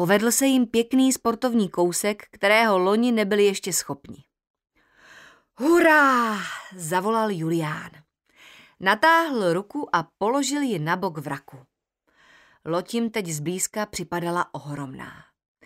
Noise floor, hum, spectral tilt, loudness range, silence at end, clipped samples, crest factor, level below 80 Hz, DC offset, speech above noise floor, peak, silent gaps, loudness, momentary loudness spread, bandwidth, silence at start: -70 dBFS; none; -4 dB/octave; 8 LU; 0.55 s; under 0.1%; 20 dB; -64 dBFS; under 0.1%; 48 dB; -4 dBFS; 4.50-4.54 s; -22 LUFS; 16 LU; 16 kHz; 0 s